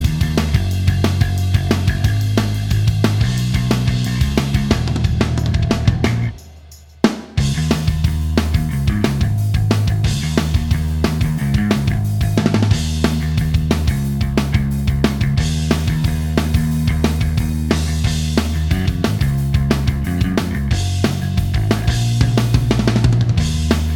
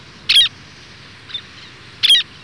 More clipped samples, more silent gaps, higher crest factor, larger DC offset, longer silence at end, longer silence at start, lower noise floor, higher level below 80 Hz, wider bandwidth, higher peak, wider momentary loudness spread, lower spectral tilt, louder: neither; neither; about the same, 16 dB vs 14 dB; neither; second, 0 s vs 0.2 s; second, 0 s vs 0.3 s; about the same, -40 dBFS vs -40 dBFS; first, -24 dBFS vs -56 dBFS; first, 19 kHz vs 11 kHz; first, 0 dBFS vs -6 dBFS; second, 3 LU vs 18 LU; first, -6 dB/octave vs 1 dB/octave; second, -17 LUFS vs -12 LUFS